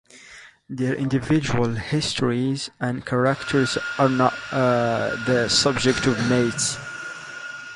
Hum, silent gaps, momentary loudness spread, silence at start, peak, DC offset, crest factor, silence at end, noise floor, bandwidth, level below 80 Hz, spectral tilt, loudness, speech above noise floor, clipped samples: none; none; 14 LU; 0.15 s; -2 dBFS; under 0.1%; 20 dB; 0 s; -46 dBFS; 11.5 kHz; -50 dBFS; -4.5 dB/octave; -22 LUFS; 25 dB; under 0.1%